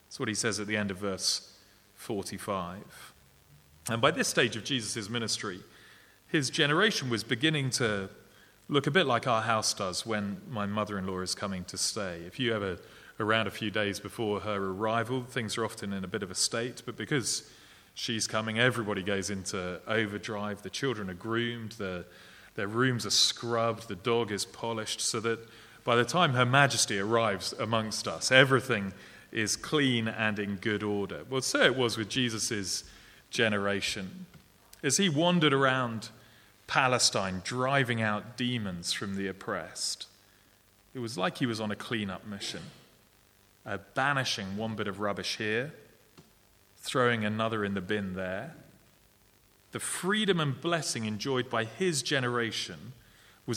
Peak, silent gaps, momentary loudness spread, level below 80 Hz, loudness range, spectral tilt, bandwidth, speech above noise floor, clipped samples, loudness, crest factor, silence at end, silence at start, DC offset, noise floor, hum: -4 dBFS; none; 13 LU; -66 dBFS; 7 LU; -3.5 dB/octave; 19 kHz; 33 dB; under 0.1%; -30 LUFS; 28 dB; 0 s; 0.1 s; under 0.1%; -63 dBFS; none